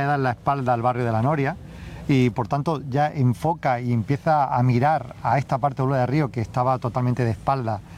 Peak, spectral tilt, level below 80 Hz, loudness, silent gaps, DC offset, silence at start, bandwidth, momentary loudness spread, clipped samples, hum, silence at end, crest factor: -8 dBFS; -8 dB/octave; -48 dBFS; -22 LUFS; none; under 0.1%; 0 s; 10 kHz; 4 LU; under 0.1%; none; 0 s; 14 dB